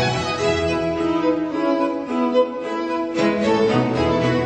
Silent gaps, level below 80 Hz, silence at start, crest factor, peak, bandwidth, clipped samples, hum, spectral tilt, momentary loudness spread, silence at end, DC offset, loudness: none; -44 dBFS; 0 s; 14 dB; -6 dBFS; 9 kHz; under 0.1%; none; -6 dB/octave; 5 LU; 0 s; under 0.1%; -20 LUFS